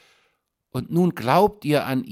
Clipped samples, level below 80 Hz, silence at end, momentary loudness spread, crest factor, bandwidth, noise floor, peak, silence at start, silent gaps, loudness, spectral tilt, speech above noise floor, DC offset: under 0.1%; -54 dBFS; 0 s; 12 LU; 18 dB; 16 kHz; -70 dBFS; -4 dBFS; 0.75 s; none; -21 LUFS; -7 dB/octave; 49 dB; under 0.1%